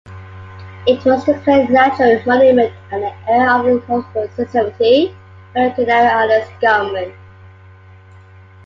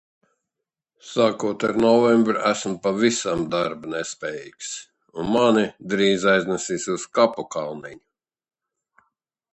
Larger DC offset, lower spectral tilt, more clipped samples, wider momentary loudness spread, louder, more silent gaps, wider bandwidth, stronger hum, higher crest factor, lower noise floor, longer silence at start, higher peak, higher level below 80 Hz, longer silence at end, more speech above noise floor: neither; first, -6.5 dB/octave vs -4.5 dB/octave; neither; about the same, 13 LU vs 15 LU; first, -14 LUFS vs -22 LUFS; neither; second, 7 kHz vs 8.6 kHz; neither; second, 14 dB vs 20 dB; second, -41 dBFS vs -85 dBFS; second, 0.05 s vs 1.05 s; about the same, -2 dBFS vs -4 dBFS; first, -46 dBFS vs -60 dBFS; about the same, 1.55 s vs 1.55 s; second, 27 dB vs 63 dB